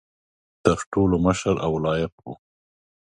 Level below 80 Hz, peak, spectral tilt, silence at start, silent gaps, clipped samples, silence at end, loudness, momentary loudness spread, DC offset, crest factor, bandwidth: -42 dBFS; -2 dBFS; -6.5 dB/octave; 0.65 s; 0.86-0.92 s, 2.12-2.18 s; under 0.1%; 0.7 s; -23 LUFS; 21 LU; under 0.1%; 22 dB; 11.5 kHz